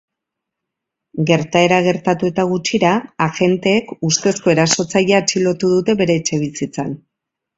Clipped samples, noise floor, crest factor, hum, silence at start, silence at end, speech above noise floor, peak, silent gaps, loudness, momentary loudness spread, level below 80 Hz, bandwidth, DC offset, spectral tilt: under 0.1%; -81 dBFS; 16 dB; none; 1.15 s; 0.6 s; 65 dB; 0 dBFS; none; -16 LUFS; 9 LU; -54 dBFS; 8 kHz; under 0.1%; -4.5 dB/octave